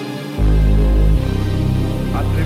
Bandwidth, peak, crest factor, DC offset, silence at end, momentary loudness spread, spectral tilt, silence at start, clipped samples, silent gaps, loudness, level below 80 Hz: 13.5 kHz; -4 dBFS; 12 dB; under 0.1%; 0 s; 5 LU; -7.5 dB/octave; 0 s; under 0.1%; none; -17 LUFS; -16 dBFS